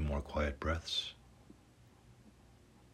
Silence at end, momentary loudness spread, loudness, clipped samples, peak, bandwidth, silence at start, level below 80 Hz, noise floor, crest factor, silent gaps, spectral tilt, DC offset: 0.1 s; 20 LU; -38 LUFS; under 0.1%; -22 dBFS; 13 kHz; 0 s; -48 dBFS; -63 dBFS; 18 dB; none; -5 dB/octave; under 0.1%